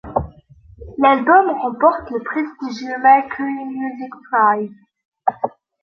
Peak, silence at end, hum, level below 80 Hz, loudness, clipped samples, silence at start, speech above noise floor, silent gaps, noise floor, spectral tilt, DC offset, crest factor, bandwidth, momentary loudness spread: -2 dBFS; 0.35 s; none; -46 dBFS; -18 LUFS; under 0.1%; 0.05 s; 29 dB; 5.05-5.12 s; -46 dBFS; -6.5 dB/octave; under 0.1%; 18 dB; 6.4 kHz; 14 LU